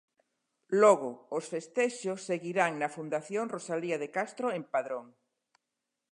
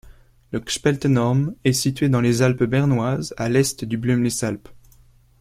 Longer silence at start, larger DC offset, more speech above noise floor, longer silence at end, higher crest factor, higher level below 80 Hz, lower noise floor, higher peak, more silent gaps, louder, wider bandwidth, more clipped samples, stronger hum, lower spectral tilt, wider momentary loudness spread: first, 0.7 s vs 0.05 s; neither; first, 56 dB vs 33 dB; first, 1.05 s vs 0.65 s; about the same, 22 dB vs 18 dB; second, -88 dBFS vs -48 dBFS; first, -86 dBFS vs -53 dBFS; second, -10 dBFS vs -4 dBFS; neither; second, -31 LUFS vs -21 LUFS; second, 11 kHz vs 16 kHz; neither; neither; about the same, -5 dB/octave vs -5.5 dB/octave; first, 12 LU vs 7 LU